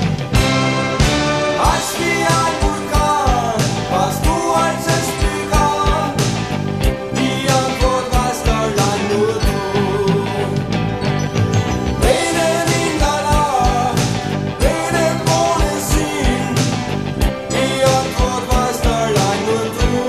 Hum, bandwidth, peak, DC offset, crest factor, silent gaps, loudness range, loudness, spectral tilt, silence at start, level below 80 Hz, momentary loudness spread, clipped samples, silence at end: none; 14 kHz; -2 dBFS; 0.2%; 14 dB; none; 1 LU; -16 LUFS; -4.5 dB/octave; 0 s; -24 dBFS; 4 LU; under 0.1%; 0 s